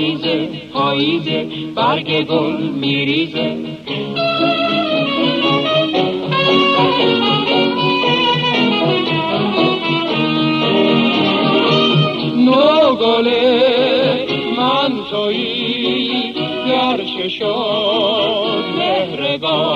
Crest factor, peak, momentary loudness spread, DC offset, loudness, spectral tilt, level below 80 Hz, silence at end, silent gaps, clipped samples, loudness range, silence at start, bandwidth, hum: 14 dB; -2 dBFS; 7 LU; under 0.1%; -15 LUFS; -6.5 dB/octave; -56 dBFS; 0 s; none; under 0.1%; 4 LU; 0 s; 8.4 kHz; none